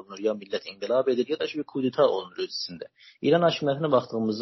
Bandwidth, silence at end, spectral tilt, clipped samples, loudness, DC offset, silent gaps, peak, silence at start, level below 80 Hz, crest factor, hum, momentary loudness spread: 6.2 kHz; 0 s; -4.5 dB/octave; under 0.1%; -26 LUFS; under 0.1%; none; -8 dBFS; 0.1 s; -72 dBFS; 18 dB; none; 11 LU